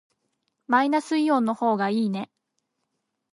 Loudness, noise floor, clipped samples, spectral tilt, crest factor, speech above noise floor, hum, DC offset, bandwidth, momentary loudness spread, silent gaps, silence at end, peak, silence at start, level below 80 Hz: -24 LUFS; -79 dBFS; under 0.1%; -6 dB/octave; 18 dB; 56 dB; none; under 0.1%; 11.5 kHz; 8 LU; none; 1.1 s; -6 dBFS; 0.7 s; -80 dBFS